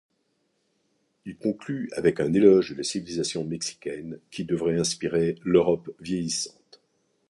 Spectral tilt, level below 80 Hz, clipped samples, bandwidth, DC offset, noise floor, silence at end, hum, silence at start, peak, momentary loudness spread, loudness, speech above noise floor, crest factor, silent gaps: -5 dB/octave; -58 dBFS; under 0.1%; 11.5 kHz; under 0.1%; -73 dBFS; 0.8 s; none; 1.25 s; -6 dBFS; 16 LU; -25 LUFS; 48 dB; 22 dB; none